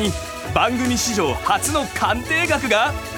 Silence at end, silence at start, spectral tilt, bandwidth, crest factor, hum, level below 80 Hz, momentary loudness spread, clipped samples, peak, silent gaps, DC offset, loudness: 0 s; 0 s; -3.5 dB/octave; 19.5 kHz; 18 dB; none; -38 dBFS; 4 LU; under 0.1%; -2 dBFS; none; under 0.1%; -19 LUFS